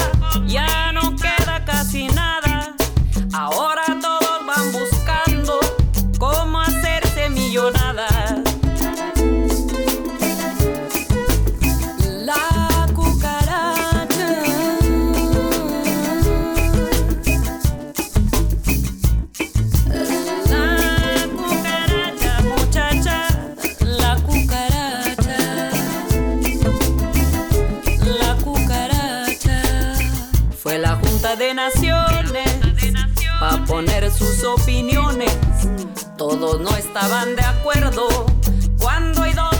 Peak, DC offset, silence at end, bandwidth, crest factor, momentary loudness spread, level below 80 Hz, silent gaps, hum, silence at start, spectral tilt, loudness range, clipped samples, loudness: -4 dBFS; under 0.1%; 0 s; over 20 kHz; 14 dB; 3 LU; -22 dBFS; none; none; 0 s; -5 dB/octave; 1 LU; under 0.1%; -19 LUFS